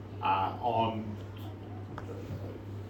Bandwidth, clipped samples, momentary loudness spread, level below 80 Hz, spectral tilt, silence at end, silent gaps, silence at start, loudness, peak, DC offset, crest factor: 17 kHz; under 0.1%; 13 LU; -58 dBFS; -7.5 dB/octave; 0 s; none; 0 s; -35 LUFS; -18 dBFS; under 0.1%; 18 dB